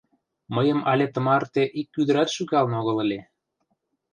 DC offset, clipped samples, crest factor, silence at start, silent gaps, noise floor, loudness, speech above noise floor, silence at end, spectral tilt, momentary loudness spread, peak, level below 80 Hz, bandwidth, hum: under 0.1%; under 0.1%; 16 dB; 0.5 s; none; -74 dBFS; -23 LUFS; 52 dB; 0.9 s; -6 dB/octave; 5 LU; -8 dBFS; -68 dBFS; 10 kHz; none